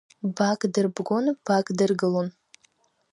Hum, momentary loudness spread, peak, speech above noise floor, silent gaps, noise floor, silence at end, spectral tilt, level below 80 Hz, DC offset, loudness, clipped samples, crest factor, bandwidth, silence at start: none; 5 LU; -10 dBFS; 42 dB; none; -66 dBFS; 0.8 s; -6 dB/octave; -76 dBFS; under 0.1%; -25 LUFS; under 0.1%; 16 dB; 11 kHz; 0.25 s